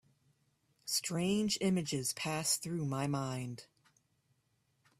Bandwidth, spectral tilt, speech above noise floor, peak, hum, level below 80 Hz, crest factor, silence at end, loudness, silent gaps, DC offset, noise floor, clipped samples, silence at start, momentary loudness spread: 15.5 kHz; -4 dB/octave; 42 dB; -20 dBFS; none; -72 dBFS; 18 dB; 1.35 s; -35 LUFS; none; under 0.1%; -77 dBFS; under 0.1%; 0.85 s; 10 LU